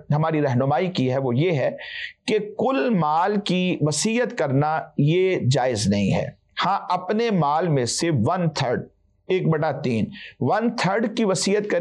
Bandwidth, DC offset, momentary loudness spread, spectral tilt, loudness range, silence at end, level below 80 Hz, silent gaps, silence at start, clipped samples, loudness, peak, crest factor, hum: 11.5 kHz; under 0.1%; 5 LU; -5.5 dB/octave; 2 LU; 0 s; -60 dBFS; none; 0.1 s; under 0.1%; -22 LUFS; -12 dBFS; 10 dB; none